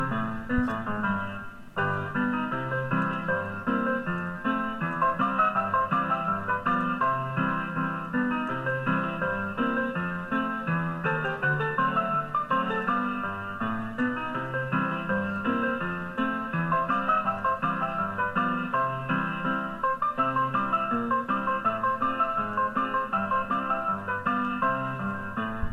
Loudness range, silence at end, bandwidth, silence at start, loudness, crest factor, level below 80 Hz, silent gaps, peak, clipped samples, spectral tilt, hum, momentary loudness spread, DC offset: 2 LU; 0 s; 13.5 kHz; 0 s; -28 LUFS; 16 dB; -52 dBFS; none; -12 dBFS; under 0.1%; -8 dB/octave; none; 5 LU; under 0.1%